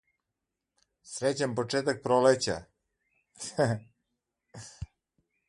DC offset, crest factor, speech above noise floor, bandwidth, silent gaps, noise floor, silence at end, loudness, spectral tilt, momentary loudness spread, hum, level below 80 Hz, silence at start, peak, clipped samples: under 0.1%; 22 dB; 58 dB; 11.5 kHz; none; -86 dBFS; 0.65 s; -29 LUFS; -4.5 dB/octave; 22 LU; none; -58 dBFS; 1.05 s; -10 dBFS; under 0.1%